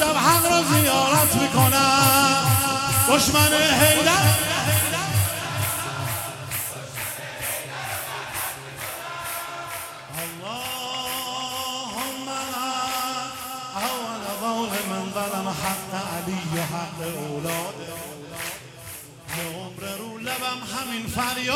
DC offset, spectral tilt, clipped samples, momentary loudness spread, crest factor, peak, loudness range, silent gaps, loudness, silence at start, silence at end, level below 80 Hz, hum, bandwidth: under 0.1%; -3 dB/octave; under 0.1%; 16 LU; 20 dB; -2 dBFS; 13 LU; none; -22 LUFS; 0 s; 0 s; -52 dBFS; none; 17.5 kHz